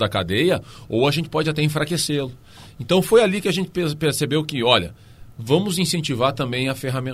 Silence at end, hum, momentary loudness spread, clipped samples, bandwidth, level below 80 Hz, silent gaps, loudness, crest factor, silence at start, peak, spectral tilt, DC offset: 0 s; none; 9 LU; under 0.1%; 15.5 kHz; -50 dBFS; none; -20 LUFS; 20 dB; 0 s; 0 dBFS; -5 dB/octave; under 0.1%